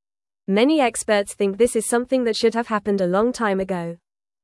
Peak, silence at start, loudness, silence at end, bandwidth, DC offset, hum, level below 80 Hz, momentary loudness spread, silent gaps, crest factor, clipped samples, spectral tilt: -6 dBFS; 0.5 s; -20 LUFS; 0.5 s; 12 kHz; under 0.1%; none; -56 dBFS; 7 LU; none; 16 dB; under 0.1%; -4.5 dB/octave